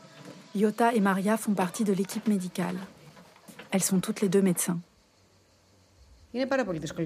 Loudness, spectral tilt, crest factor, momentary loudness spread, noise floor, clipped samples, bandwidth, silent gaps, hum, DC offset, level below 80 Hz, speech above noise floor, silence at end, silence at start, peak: -28 LUFS; -5 dB/octave; 18 dB; 14 LU; -62 dBFS; under 0.1%; 15.5 kHz; none; none; under 0.1%; -66 dBFS; 36 dB; 0 s; 0.15 s; -10 dBFS